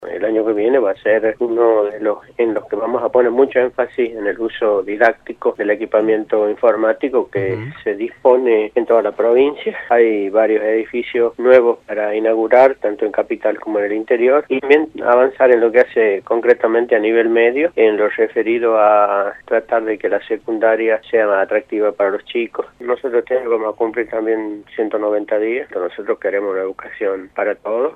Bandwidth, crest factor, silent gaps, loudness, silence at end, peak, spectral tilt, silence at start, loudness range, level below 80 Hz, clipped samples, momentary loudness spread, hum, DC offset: 4.8 kHz; 16 dB; none; -16 LUFS; 0.05 s; 0 dBFS; -7.5 dB/octave; 0 s; 5 LU; -58 dBFS; under 0.1%; 9 LU; none; under 0.1%